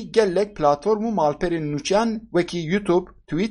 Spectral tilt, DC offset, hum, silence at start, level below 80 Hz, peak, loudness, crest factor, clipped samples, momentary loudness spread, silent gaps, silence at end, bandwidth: -6 dB/octave; under 0.1%; none; 0 s; -46 dBFS; -4 dBFS; -22 LUFS; 18 dB; under 0.1%; 5 LU; none; 0 s; 11 kHz